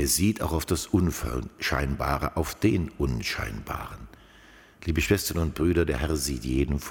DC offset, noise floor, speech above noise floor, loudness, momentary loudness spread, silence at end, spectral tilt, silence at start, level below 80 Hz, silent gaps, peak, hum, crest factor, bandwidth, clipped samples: under 0.1%; -53 dBFS; 26 dB; -27 LUFS; 9 LU; 0 s; -5 dB/octave; 0 s; -36 dBFS; none; -10 dBFS; none; 18 dB; 17.5 kHz; under 0.1%